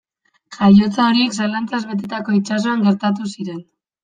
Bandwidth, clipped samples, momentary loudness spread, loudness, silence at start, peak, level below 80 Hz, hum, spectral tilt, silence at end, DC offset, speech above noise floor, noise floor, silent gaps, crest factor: 9.4 kHz; under 0.1%; 14 LU; -17 LUFS; 0.5 s; -2 dBFS; -56 dBFS; none; -6 dB/octave; 0.4 s; under 0.1%; 33 dB; -49 dBFS; none; 16 dB